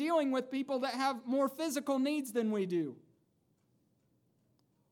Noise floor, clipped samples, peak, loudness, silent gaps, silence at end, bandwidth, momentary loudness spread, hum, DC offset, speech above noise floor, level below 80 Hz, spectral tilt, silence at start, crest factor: -75 dBFS; under 0.1%; -20 dBFS; -34 LUFS; none; 1.95 s; 18.5 kHz; 4 LU; none; under 0.1%; 41 dB; under -90 dBFS; -5 dB/octave; 0 s; 16 dB